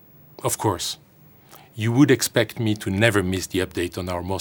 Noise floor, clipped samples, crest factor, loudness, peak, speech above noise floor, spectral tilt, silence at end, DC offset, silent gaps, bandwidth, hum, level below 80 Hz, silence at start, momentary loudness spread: -51 dBFS; under 0.1%; 22 dB; -22 LUFS; 0 dBFS; 29 dB; -5 dB/octave; 0 s; under 0.1%; none; over 20 kHz; none; -52 dBFS; 0.4 s; 12 LU